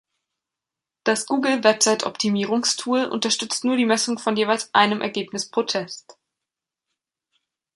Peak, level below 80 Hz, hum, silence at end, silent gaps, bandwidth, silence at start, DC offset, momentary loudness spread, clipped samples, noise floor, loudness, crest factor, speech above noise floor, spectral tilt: -2 dBFS; -72 dBFS; none; 1.8 s; none; 11.5 kHz; 1.05 s; under 0.1%; 8 LU; under 0.1%; -87 dBFS; -21 LUFS; 20 dB; 65 dB; -2.5 dB/octave